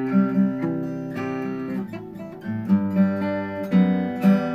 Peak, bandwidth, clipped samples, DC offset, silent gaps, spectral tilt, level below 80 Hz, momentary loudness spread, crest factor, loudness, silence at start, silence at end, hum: -8 dBFS; 5.2 kHz; under 0.1%; under 0.1%; none; -9.5 dB/octave; -62 dBFS; 11 LU; 14 dB; -23 LUFS; 0 s; 0 s; none